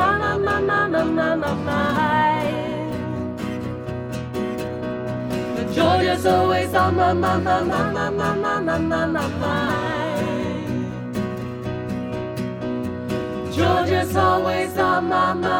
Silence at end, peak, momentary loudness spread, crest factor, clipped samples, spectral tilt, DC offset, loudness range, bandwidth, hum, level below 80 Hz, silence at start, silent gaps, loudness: 0 s; -4 dBFS; 9 LU; 16 dB; under 0.1%; -6 dB/octave; under 0.1%; 7 LU; 19 kHz; none; -46 dBFS; 0 s; none; -22 LUFS